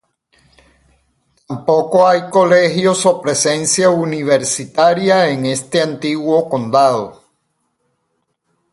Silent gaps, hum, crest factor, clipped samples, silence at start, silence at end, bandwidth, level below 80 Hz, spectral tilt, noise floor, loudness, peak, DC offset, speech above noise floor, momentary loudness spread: none; none; 16 dB; under 0.1%; 1.5 s; 1.6 s; 11.5 kHz; -60 dBFS; -4 dB/octave; -68 dBFS; -14 LUFS; 0 dBFS; under 0.1%; 55 dB; 7 LU